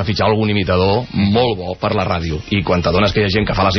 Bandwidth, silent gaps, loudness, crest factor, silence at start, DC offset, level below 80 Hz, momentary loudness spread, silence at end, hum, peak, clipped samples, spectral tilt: 6.4 kHz; none; -16 LUFS; 12 dB; 0 s; under 0.1%; -34 dBFS; 5 LU; 0 s; none; -4 dBFS; under 0.1%; -4.5 dB/octave